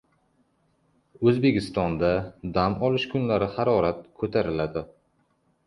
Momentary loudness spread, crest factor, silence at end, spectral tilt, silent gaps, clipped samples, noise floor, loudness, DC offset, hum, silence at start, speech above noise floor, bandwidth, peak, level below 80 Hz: 7 LU; 18 dB; 0.8 s; -8 dB/octave; none; under 0.1%; -68 dBFS; -25 LUFS; under 0.1%; none; 1.2 s; 44 dB; 11.5 kHz; -8 dBFS; -48 dBFS